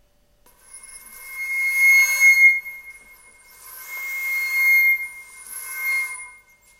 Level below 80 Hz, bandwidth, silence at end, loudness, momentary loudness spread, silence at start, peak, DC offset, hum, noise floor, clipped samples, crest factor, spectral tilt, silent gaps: -64 dBFS; 16 kHz; 0.5 s; -16 LUFS; 24 LU; 0.75 s; -6 dBFS; under 0.1%; 50 Hz at -70 dBFS; -57 dBFS; under 0.1%; 16 dB; 3.5 dB/octave; none